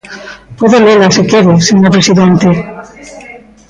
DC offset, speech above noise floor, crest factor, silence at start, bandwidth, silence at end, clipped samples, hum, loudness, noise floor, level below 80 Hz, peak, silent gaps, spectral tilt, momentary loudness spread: under 0.1%; 27 dB; 8 dB; 0.1 s; 9.2 kHz; 0.3 s; under 0.1%; none; -7 LUFS; -33 dBFS; -42 dBFS; 0 dBFS; none; -5.5 dB/octave; 21 LU